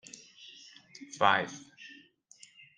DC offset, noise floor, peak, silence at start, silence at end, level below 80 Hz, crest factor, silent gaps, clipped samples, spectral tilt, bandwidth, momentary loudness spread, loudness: under 0.1%; -59 dBFS; -8 dBFS; 1 s; 0.9 s; -82 dBFS; 28 dB; none; under 0.1%; -3 dB/octave; 10 kHz; 25 LU; -29 LUFS